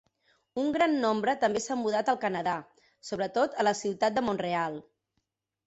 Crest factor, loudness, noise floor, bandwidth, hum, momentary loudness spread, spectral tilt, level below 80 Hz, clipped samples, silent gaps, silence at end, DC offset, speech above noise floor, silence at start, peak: 16 dB; -29 LUFS; -81 dBFS; 8.2 kHz; none; 10 LU; -4.5 dB/octave; -68 dBFS; under 0.1%; none; 0.85 s; under 0.1%; 53 dB; 0.55 s; -14 dBFS